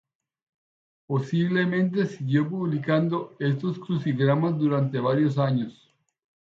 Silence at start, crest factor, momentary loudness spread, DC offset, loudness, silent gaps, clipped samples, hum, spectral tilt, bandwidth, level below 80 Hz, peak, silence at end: 1.1 s; 18 dB; 6 LU; under 0.1%; -25 LUFS; none; under 0.1%; none; -8.5 dB/octave; 7.4 kHz; -70 dBFS; -8 dBFS; 0.75 s